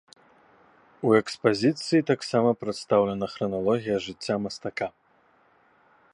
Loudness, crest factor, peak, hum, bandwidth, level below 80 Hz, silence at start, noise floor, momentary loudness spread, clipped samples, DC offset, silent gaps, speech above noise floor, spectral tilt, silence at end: -26 LUFS; 22 dB; -6 dBFS; none; 11 kHz; -64 dBFS; 1 s; -63 dBFS; 9 LU; under 0.1%; under 0.1%; none; 38 dB; -6 dB/octave; 1.25 s